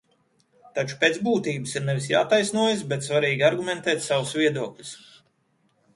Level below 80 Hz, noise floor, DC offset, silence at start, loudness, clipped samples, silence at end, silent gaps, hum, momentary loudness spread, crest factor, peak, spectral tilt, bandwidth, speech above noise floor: -68 dBFS; -68 dBFS; under 0.1%; 0.75 s; -24 LUFS; under 0.1%; 1 s; none; none; 12 LU; 20 dB; -4 dBFS; -4.5 dB/octave; 11.5 kHz; 44 dB